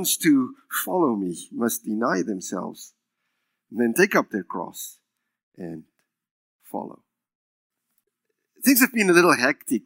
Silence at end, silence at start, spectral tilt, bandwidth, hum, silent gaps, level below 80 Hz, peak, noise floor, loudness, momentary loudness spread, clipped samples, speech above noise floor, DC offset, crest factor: 0.05 s; 0 s; -3.5 dB/octave; 16.5 kHz; none; 5.43-5.52 s, 6.31-6.59 s, 7.35-7.70 s; -80 dBFS; -2 dBFS; -78 dBFS; -22 LUFS; 20 LU; under 0.1%; 55 dB; under 0.1%; 22 dB